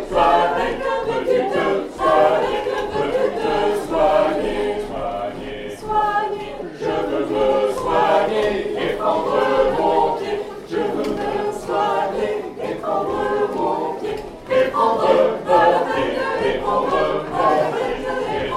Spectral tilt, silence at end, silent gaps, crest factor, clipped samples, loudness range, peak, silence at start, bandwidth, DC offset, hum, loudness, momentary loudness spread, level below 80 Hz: -5.5 dB/octave; 0 s; none; 18 dB; under 0.1%; 4 LU; -2 dBFS; 0 s; 14.5 kHz; under 0.1%; none; -20 LUFS; 10 LU; -42 dBFS